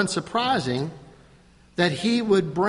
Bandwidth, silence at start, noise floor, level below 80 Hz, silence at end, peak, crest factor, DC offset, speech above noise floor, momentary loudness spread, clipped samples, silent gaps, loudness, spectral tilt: 11.5 kHz; 0 s; -54 dBFS; -58 dBFS; 0 s; -6 dBFS; 18 dB; under 0.1%; 31 dB; 10 LU; under 0.1%; none; -24 LUFS; -5 dB/octave